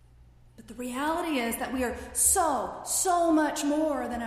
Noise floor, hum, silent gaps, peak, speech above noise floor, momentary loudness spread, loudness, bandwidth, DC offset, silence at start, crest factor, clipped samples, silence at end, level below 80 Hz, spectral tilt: -55 dBFS; none; none; -8 dBFS; 28 dB; 9 LU; -27 LUFS; 15.5 kHz; under 0.1%; 0.6 s; 20 dB; under 0.1%; 0 s; -52 dBFS; -2.5 dB/octave